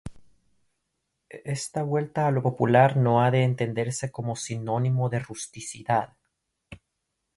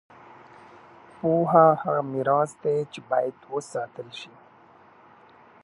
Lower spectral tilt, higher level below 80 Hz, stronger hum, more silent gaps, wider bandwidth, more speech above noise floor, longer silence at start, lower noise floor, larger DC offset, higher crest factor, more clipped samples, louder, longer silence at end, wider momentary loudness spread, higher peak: about the same, -6 dB/octave vs -7 dB/octave; first, -58 dBFS vs -72 dBFS; neither; neither; about the same, 11.5 kHz vs 11.5 kHz; first, 56 dB vs 30 dB; second, 0.05 s vs 1.25 s; first, -80 dBFS vs -54 dBFS; neither; about the same, 20 dB vs 22 dB; neither; about the same, -25 LUFS vs -24 LUFS; second, 0.6 s vs 1.35 s; second, 15 LU vs 20 LU; about the same, -6 dBFS vs -4 dBFS